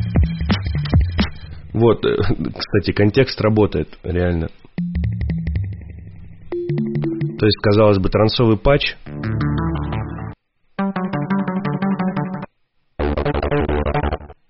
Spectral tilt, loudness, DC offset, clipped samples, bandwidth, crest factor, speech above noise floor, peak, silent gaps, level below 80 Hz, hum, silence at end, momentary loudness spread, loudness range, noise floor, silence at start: -6 dB/octave; -19 LUFS; under 0.1%; under 0.1%; 6 kHz; 16 dB; 47 dB; -2 dBFS; none; -28 dBFS; none; 0.15 s; 13 LU; 6 LU; -63 dBFS; 0 s